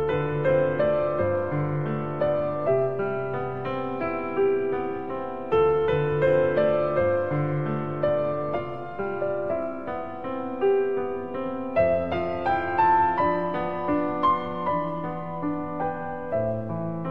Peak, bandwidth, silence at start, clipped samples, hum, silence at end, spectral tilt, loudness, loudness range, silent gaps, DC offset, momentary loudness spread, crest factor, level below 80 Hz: -10 dBFS; 5.4 kHz; 0 s; under 0.1%; none; 0 s; -9.5 dB/octave; -26 LUFS; 4 LU; none; 0.8%; 9 LU; 16 dB; -52 dBFS